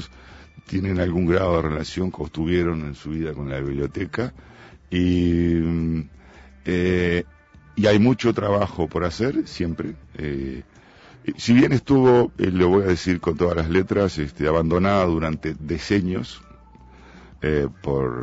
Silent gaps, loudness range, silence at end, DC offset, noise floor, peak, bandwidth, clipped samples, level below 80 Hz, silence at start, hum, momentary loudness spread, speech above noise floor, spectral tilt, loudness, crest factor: none; 6 LU; 0 s; under 0.1%; -48 dBFS; -6 dBFS; 8 kHz; under 0.1%; -40 dBFS; 0 s; none; 13 LU; 27 dB; -7 dB/octave; -22 LUFS; 16 dB